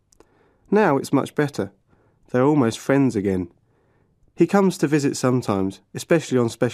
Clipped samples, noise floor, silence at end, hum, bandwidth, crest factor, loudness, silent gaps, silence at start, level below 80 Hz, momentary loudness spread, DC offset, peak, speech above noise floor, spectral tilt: under 0.1%; -62 dBFS; 0 s; none; 15 kHz; 18 dB; -21 LUFS; none; 0.7 s; -62 dBFS; 9 LU; under 0.1%; -4 dBFS; 42 dB; -6.5 dB/octave